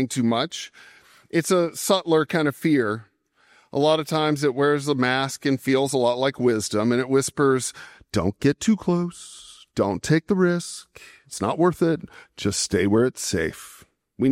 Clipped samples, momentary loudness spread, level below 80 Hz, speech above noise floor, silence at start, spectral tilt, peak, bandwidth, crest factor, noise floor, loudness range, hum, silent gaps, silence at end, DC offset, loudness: under 0.1%; 13 LU; -58 dBFS; 38 dB; 0 s; -5 dB/octave; -4 dBFS; 16 kHz; 18 dB; -60 dBFS; 2 LU; none; none; 0 s; under 0.1%; -23 LUFS